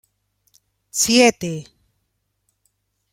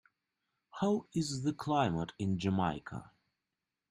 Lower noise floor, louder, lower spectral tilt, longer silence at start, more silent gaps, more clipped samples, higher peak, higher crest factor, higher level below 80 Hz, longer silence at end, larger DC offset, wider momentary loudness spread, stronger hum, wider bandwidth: second, -72 dBFS vs -89 dBFS; first, -17 LUFS vs -34 LUFS; second, -2.5 dB/octave vs -6 dB/octave; first, 0.95 s vs 0.75 s; neither; neither; first, -2 dBFS vs -18 dBFS; about the same, 22 dB vs 18 dB; first, -60 dBFS vs -66 dBFS; first, 1.5 s vs 0.85 s; neither; first, 16 LU vs 13 LU; first, 50 Hz at -60 dBFS vs none; first, 16.5 kHz vs 12 kHz